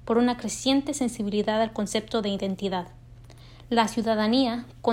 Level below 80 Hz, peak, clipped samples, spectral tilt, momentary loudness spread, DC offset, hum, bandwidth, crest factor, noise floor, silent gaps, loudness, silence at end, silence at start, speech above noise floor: -52 dBFS; -8 dBFS; under 0.1%; -4.5 dB/octave; 6 LU; under 0.1%; none; 16 kHz; 18 dB; -47 dBFS; none; -26 LUFS; 0 s; 0 s; 22 dB